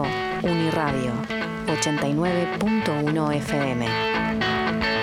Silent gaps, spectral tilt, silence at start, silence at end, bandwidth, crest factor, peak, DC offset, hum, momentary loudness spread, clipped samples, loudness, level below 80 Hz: none; -5 dB/octave; 0 s; 0 s; 15.5 kHz; 16 dB; -8 dBFS; under 0.1%; none; 3 LU; under 0.1%; -24 LUFS; -46 dBFS